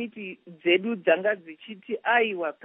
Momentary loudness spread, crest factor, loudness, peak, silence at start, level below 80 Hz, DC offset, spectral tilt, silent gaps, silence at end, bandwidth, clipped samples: 16 LU; 18 dB; -25 LUFS; -8 dBFS; 0 s; -88 dBFS; under 0.1%; -1.5 dB/octave; none; 0.1 s; 3.9 kHz; under 0.1%